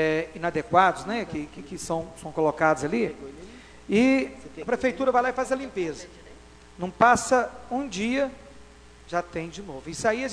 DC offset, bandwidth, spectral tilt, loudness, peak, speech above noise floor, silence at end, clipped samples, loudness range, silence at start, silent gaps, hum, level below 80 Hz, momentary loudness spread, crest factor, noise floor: under 0.1%; 11 kHz; -4.5 dB/octave; -25 LUFS; -4 dBFS; 23 dB; 0 s; under 0.1%; 2 LU; 0 s; none; none; -52 dBFS; 16 LU; 22 dB; -49 dBFS